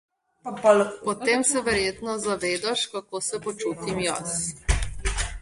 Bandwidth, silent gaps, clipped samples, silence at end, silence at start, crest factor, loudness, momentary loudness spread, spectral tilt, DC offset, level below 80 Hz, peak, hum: 11.5 kHz; none; under 0.1%; 0 s; 0.45 s; 20 dB; -25 LUFS; 9 LU; -3 dB/octave; under 0.1%; -36 dBFS; -6 dBFS; none